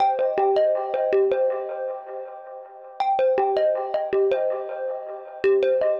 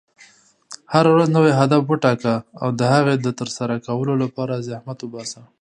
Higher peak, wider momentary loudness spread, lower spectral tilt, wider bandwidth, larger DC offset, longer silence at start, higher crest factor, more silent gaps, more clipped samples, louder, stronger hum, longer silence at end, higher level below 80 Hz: second, -10 dBFS vs 0 dBFS; about the same, 15 LU vs 16 LU; about the same, -6 dB/octave vs -6.5 dB/octave; second, 5.8 kHz vs 10 kHz; neither; second, 0 s vs 0.7 s; second, 12 dB vs 18 dB; neither; neither; second, -23 LUFS vs -19 LUFS; neither; second, 0 s vs 0.2 s; second, -68 dBFS vs -62 dBFS